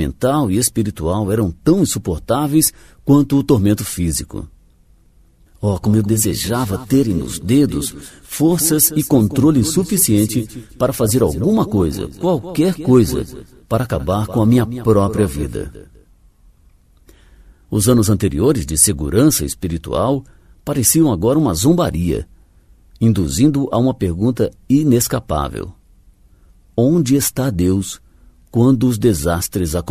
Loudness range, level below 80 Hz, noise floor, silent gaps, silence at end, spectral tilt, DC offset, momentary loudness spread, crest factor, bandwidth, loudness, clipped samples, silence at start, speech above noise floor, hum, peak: 4 LU; -34 dBFS; -51 dBFS; none; 0 s; -5.5 dB/octave; under 0.1%; 10 LU; 16 dB; 15.5 kHz; -16 LUFS; under 0.1%; 0 s; 35 dB; none; 0 dBFS